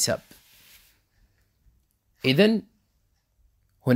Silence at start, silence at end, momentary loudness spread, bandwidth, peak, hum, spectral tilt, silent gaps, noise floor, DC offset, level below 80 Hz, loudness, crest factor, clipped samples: 0 s; 0 s; 12 LU; 16 kHz; -6 dBFS; none; -4.5 dB/octave; none; -70 dBFS; under 0.1%; -62 dBFS; -24 LUFS; 22 dB; under 0.1%